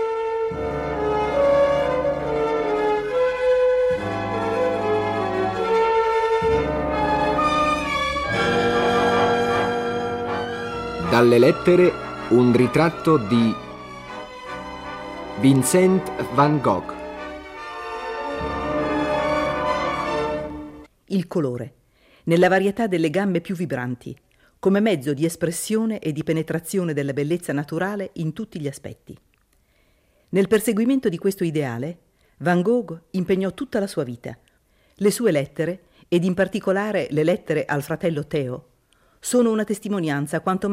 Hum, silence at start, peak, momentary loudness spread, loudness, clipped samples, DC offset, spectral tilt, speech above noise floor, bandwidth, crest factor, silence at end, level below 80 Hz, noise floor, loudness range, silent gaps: none; 0 s; -4 dBFS; 15 LU; -21 LUFS; under 0.1%; under 0.1%; -6 dB/octave; 42 dB; 16 kHz; 18 dB; 0 s; -46 dBFS; -62 dBFS; 6 LU; none